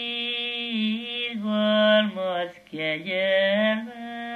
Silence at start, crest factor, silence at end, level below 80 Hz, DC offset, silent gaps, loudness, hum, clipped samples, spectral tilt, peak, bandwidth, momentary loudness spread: 0 s; 16 dB; 0 s; -74 dBFS; under 0.1%; none; -24 LUFS; none; under 0.1%; -6 dB/octave; -8 dBFS; 6.2 kHz; 10 LU